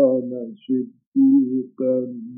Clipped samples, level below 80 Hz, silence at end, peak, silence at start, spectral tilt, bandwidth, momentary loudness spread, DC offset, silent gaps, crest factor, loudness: under 0.1%; -80 dBFS; 0 s; -6 dBFS; 0 s; -11.5 dB/octave; 3.2 kHz; 10 LU; under 0.1%; 1.07-1.12 s; 14 dB; -21 LUFS